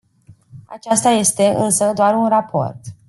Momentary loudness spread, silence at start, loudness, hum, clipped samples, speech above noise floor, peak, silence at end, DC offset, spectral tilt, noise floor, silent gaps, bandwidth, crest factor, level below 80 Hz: 9 LU; 0.3 s; -16 LUFS; none; under 0.1%; 33 dB; -2 dBFS; 0.15 s; under 0.1%; -4 dB/octave; -49 dBFS; none; 12.5 kHz; 16 dB; -60 dBFS